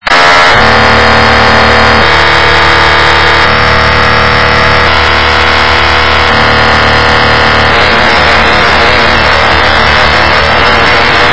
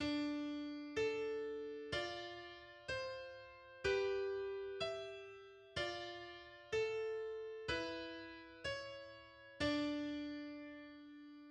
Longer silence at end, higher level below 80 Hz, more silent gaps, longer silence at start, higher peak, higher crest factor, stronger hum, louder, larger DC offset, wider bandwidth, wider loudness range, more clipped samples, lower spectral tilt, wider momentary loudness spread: about the same, 0 s vs 0 s; first, -18 dBFS vs -68 dBFS; neither; about the same, 0 s vs 0 s; first, 0 dBFS vs -26 dBFS; second, 6 dB vs 18 dB; neither; first, -4 LUFS vs -44 LUFS; first, 10% vs under 0.1%; second, 8 kHz vs 10 kHz; about the same, 1 LU vs 1 LU; first, 8% vs under 0.1%; about the same, -4 dB/octave vs -4.5 dB/octave; second, 2 LU vs 16 LU